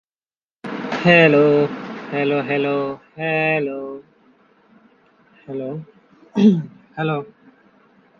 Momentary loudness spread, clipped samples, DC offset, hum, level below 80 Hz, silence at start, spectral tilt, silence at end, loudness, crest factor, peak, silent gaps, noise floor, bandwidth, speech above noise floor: 20 LU; under 0.1%; under 0.1%; none; -64 dBFS; 0.65 s; -7.5 dB/octave; 0.95 s; -18 LUFS; 20 dB; 0 dBFS; none; under -90 dBFS; 7 kHz; over 72 dB